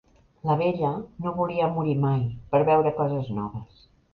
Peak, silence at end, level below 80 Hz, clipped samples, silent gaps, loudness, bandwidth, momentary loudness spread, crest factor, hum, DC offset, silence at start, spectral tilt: -8 dBFS; 0.5 s; -54 dBFS; under 0.1%; none; -25 LUFS; 5 kHz; 11 LU; 18 dB; none; under 0.1%; 0.45 s; -10.5 dB/octave